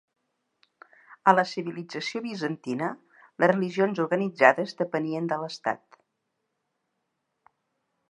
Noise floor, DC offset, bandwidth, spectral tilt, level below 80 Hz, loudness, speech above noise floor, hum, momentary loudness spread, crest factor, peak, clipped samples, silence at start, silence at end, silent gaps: -79 dBFS; under 0.1%; 11 kHz; -6 dB/octave; -82 dBFS; -26 LUFS; 54 dB; none; 13 LU; 26 dB; -2 dBFS; under 0.1%; 1.1 s; 2.35 s; none